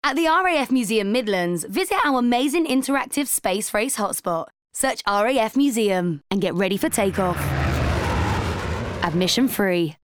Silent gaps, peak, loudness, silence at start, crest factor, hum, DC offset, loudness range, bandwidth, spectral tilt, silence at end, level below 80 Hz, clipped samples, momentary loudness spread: none; -4 dBFS; -21 LUFS; 0.05 s; 18 dB; none; under 0.1%; 2 LU; over 20 kHz; -4.5 dB/octave; 0.1 s; -38 dBFS; under 0.1%; 5 LU